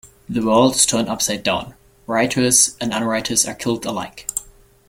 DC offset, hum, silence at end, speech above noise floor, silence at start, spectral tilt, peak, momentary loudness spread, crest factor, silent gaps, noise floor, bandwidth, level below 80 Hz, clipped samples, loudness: under 0.1%; none; 0.4 s; 27 dB; 0.05 s; -2.5 dB/octave; 0 dBFS; 13 LU; 20 dB; none; -45 dBFS; 16.5 kHz; -50 dBFS; under 0.1%; -18 LUFS